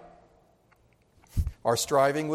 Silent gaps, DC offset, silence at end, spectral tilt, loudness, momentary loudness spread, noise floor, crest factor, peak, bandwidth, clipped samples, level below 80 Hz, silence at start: none; under 0.1%; 0 s; -4.5 dB/octave; -27 LUFS; 10 LU; -64 dBFS; 20 dB; -10 dBFS; 16.5 kHz; under 0.1%; -40 dBFS; 0.05 s